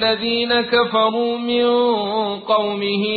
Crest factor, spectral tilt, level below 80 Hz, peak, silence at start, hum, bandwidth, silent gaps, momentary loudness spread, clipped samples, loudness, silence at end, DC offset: 14 dB; -9.5 dB/octave; -56 dBFS; -4 dBFS; 0 s; none; 4.8 kHz; none; 5 LU; under 0.1%; -18 LUFS; 0 s; under 0.1%